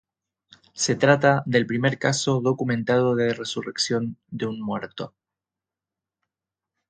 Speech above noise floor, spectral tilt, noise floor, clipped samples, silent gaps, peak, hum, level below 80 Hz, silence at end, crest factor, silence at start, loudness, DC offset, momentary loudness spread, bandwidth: 66 dB; -4.5 dB/octave; -89 dBFS; under 0.1%; none; -2 dBFS; none; -64 dBFS; 1.8 s; 24 dB; 0.75 s; -23 LUFS; under 0.1%; 13 LU; 9.4 kHz